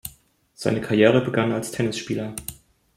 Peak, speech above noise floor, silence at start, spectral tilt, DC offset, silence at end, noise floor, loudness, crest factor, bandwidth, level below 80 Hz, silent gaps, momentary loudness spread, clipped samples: -2 dBFS; 34 dB; 0.05 s; -5.5 dB/octave; under 0.1%; 0.45 s; -56 dBFS; -22 LUFS; 20 dB; 16.5 kHz; -56 dBFS; none; 17 LU; under 0.1%